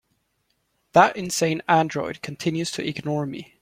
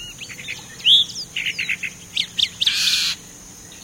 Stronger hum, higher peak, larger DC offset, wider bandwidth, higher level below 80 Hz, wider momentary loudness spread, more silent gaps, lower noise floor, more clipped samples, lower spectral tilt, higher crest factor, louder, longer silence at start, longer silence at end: neither; about the same, -2 dBFS vs -4 dBFS; neither; about the same, 16.5 kHz vs 16.5 kHz; second, -62 dBFS vs -56 dBFS; second, 11 LU vs 19 LU; neither; first, -71 dBFS vs -41 dBFS; neither; first, -4.5 dB/octave vs 1 dB/octave; about the same, 22 dB vs 18 dB; second, -23 LUFS vs -18 LUFS; first, 0.95 s vs 0 s; first, 0.15 s vs 0 s